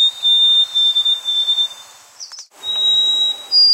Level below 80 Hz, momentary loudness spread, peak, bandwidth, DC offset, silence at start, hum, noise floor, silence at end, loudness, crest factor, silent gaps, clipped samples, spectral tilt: -68 dBFS; 17 LU; -6 dBFS; 16 kHz; under 0.1%; 0 s; none; -39 dBFS; 0 s; -12 LUFS; 10 dB; none; under 0.1%; 2.5 dB/octave